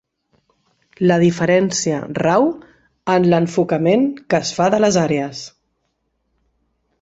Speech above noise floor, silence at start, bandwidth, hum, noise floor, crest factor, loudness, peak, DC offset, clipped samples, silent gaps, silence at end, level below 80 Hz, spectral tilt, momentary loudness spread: 54 dB; 1 s; 8 kHz; none; -70 dBFS; 16 dB; -17 LUFS; -2 dBFS; under 0.1%; under 0.1%; none; 1.55 s; -56 dBFS; -5.5 dB/octave; 10 LU